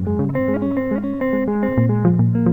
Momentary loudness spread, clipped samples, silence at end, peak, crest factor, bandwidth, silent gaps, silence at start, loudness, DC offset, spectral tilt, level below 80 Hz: 5 LU; under 0.1%; 0 s; -4 dBFS; 14 dB; over 20 kHz; none; 0 s; -19 LUFS; 0.7%; -11.5 dB/octave; -44 dBFS